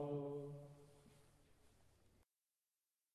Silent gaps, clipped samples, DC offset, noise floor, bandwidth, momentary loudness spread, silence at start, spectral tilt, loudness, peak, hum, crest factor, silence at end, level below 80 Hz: none; under 0.1%; under 0.1%; under -90 dBFS; 13 kHz; 21 LU; 0 s; -8.5 dB/octave; -50 LUFS; -36 dBFS; none; 18 dB; 0.9 s; -80 dBFS